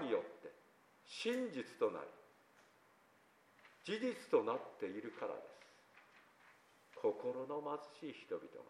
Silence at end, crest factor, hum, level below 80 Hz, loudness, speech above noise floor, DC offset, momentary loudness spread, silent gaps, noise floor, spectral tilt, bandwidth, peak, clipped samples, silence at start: 0.05 s; 24 dB; none; under -90 dBFS; -43 LUFS; 29 dB; under 0.1%; 24 LU; none; -71 dBFS; -5 dB/octave; 14.5 kHz; -20 dBFS; under 0.1%; 0 s